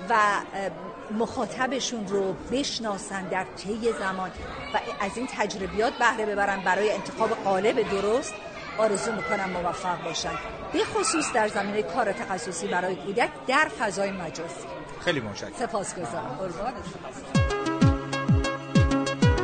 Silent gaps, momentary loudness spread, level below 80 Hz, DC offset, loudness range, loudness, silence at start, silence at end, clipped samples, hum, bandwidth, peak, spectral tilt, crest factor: none; 10 LU; -42 dBFS; under 0.1%; 4 LU; -27 LUFS; 0 s; 0 s; under 0.1%; none; 9.4 kHz; -6 dBFS; -4.5 dB/octave; 20 dB